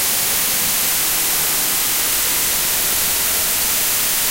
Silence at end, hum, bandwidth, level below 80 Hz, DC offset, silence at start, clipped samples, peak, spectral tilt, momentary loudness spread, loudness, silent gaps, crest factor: 0 s; none; 16.5 kHz; -44 dBFS; under 0.1%; 0 s; under 0.1%; -6 dBFS; 0.5 dB/octave; 0 LU; -15 LUFS; none; 12 dB